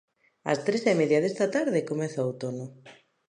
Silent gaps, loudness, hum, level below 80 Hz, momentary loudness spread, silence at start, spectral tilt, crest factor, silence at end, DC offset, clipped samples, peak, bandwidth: none; -27 LUFS; none; -76 dBFS; 13 LU; 0.45 s; -6 dB/octave; 18 dB; 0.35 s; under 0.1%; under 0.1%; -10 dBFS; 10.5 kHz